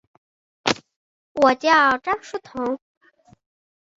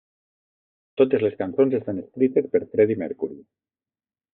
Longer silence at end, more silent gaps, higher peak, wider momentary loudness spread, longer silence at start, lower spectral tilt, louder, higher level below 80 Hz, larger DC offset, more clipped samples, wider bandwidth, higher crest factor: first, 1.2 s vs 0.95 s; first, 0.96-1.35 s vs none; first, -2 dBFS vs -6 dBFS; first, 16 LU vs 11 LU; second, 0.65 s vs 1 s; second, -3 dB/octave vs -7 dB/octave; first, -20 LUFS vs -23 LUFS; first, -62 dBFS vs -70 dBFS; neither; neither; first, 7.8 kHz vs 4 kHz; about the same, 22 dB vs 18 dB